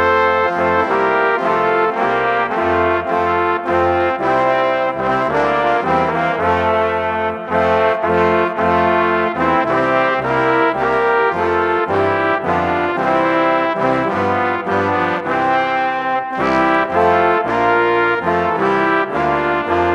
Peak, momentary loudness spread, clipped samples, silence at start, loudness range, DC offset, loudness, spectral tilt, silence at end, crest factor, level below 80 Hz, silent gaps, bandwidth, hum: 0 dBFS; 3 LU; under 0.1%; 0 s; 1 LU; under 0.1%; -16 LUFS; -6.5 dB/octave; 0 s; 16 dB; -46 dBFS; none; 10.5 kHz; none